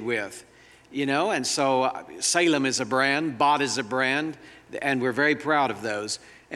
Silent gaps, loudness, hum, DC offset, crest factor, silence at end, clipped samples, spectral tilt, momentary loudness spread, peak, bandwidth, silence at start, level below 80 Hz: none; -24 LUFS; none; under 0.1%; 18 dB; 0 s; under 0.1%; -3 dB/octave; 12 LU; -8 dBFS; 13.5 kHz; 0 s; -68 dBFS